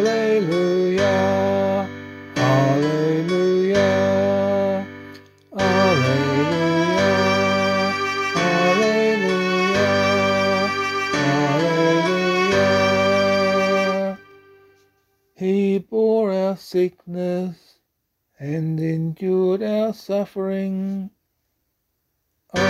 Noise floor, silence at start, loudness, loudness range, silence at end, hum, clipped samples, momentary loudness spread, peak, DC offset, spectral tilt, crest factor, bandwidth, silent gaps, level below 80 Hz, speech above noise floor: -74 dBFS; 0 s; -19 LUFS; 6 LU; 0 s; none; under 0.1%; 9 LU; -4 dBFS; under 0.1%; -5.5 dB/octave; 16 dB; 15 kHz; none; -58 dBFS; 49 dB